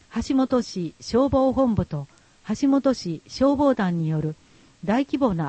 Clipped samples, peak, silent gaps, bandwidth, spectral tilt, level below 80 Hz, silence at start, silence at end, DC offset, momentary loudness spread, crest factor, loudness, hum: under 0.1%; -8 dBFS; none; 8.6 kHz; -7 dB/octave; -46 dBFS; 0.15 s; 0 s; under 0.1%; 12 LU; 14 dB; -23 LUFS; none